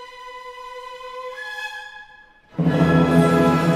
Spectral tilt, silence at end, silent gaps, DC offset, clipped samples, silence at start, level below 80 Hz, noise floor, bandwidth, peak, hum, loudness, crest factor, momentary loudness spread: -7.5 dB/octave; 0 s; none; under 0.1%; under 0.1%; 0 s; -46 dBFS; -49 dBFS; 15 kHz; -4 dBFS; none; -19 LUFS; 16 dB; 21 LU